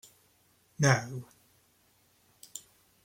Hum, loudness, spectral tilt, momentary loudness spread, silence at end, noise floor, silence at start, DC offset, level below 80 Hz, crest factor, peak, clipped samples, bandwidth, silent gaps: none; -29 LUFS; -4.5 dB/octave; 20 LU; 0.45 s; -68 dBFS; 0.8 s; under 0.1%; -70 dBFS; 24 dB; -10 dBFS; under 0.1%; 16.5 kHz; none